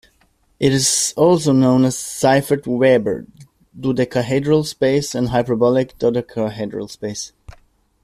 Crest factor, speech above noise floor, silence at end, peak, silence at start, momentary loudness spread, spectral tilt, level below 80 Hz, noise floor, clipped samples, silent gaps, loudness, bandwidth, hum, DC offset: 16 dB; 42 dB; 0.75 s; -2 dBFS; 0.6 s; 13 LU; -5 dB/octave; -50 dBFS; -59 dBFS; under 0.1%; none; -17 LUFS; 15 kHz; none; under 0.1%